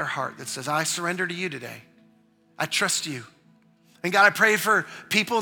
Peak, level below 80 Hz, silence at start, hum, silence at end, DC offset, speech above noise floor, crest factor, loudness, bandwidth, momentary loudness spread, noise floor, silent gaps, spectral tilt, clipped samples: -4 dBFS; -76 dBFS; 0 s; none; 0 s; under 0.1%; 36 dB; 22 dB; -23 LUFS; 19.5 kHz; 15 LU; -60 dBFS; none; -2.5 dB/octave; under 0.1%